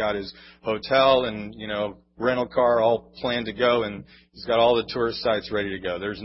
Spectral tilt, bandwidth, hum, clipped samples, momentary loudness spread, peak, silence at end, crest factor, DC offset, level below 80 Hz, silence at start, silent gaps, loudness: -9 dB/octave; 5.8 kHz; none; under 0.1%; 12 LU; -6 dBFS; 0 s; 18 dB; under 0.1%; -52 dBFS; 0 s; none; -24 LUFS